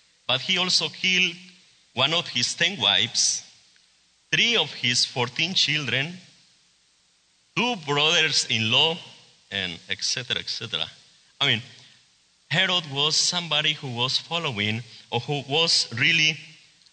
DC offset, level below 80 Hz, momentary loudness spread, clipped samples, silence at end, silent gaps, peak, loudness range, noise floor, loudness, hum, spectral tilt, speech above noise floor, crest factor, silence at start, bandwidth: under 0.1%; -70 dBFS; 10 LU; under 0.1%; 0.4 s; none; -6 dBFS; 3 LU; -64 dBFS; -22 LUFS; none; -2 dB/octave; 39 dB; 20 dB; 0.3 s; 9.4 kHz